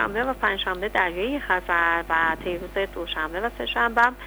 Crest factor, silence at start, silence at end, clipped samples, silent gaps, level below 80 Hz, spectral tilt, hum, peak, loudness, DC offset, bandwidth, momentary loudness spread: 18 dB; 0 s; 0 s; under 0.1%; none; -42 dBFS; -4.5 dB/octave; 50 Hz at -45 dBFS; -6 dBFS; -24 LUFS; under 0.1%; over 20 kHz; 7 LU